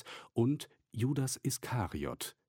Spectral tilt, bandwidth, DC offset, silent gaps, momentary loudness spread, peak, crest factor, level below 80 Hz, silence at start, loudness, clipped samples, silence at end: -5.5 dB/octave; 17 kHz; under 0.1%; none; 7 LU; -20 dBFS; 16 dB; -60 dBFS; 0.05 s; -36 LUFS; under 0.1%; 0.2 s